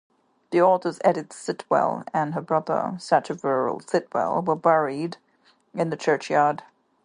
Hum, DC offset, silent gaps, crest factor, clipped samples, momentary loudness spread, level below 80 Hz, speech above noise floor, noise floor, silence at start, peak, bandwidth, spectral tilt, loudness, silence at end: none; under 0.1%; none; 20 dB; under 0.1%; 11 LU; -72 dBFS; 35 dB; -58 dBFS; 0.5 s; -4 dBFS; 11 kHz; -6 dB/octave; -24 LUFS; 0.4 s